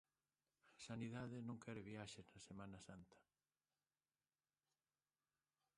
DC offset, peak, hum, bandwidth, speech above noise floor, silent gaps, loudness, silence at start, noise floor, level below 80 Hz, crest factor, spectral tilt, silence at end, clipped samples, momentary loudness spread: under 0.1%; -38 dBFS; none; 11 kHz; over 35 dB; none; -55 LUFS; 0.65 s; under -90 dBFS; -82 dBFS; 20 dB; -5.5 dB/octave; 2.55 s; under 0.1%; 10 LU